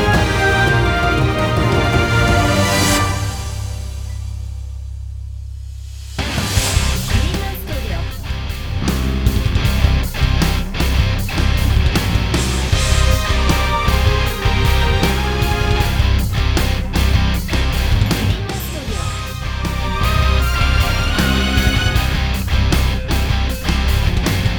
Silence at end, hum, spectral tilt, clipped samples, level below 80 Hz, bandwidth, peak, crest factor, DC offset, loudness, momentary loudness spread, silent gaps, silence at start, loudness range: 0 s; none; -4.5 dB/octave; under 0.1%; -20 dBFS; over 20 kHz; 0 dBFS; 16 dB; under 0.1%; -17 LUFS; 11 LU; none; 0 s; 5 LU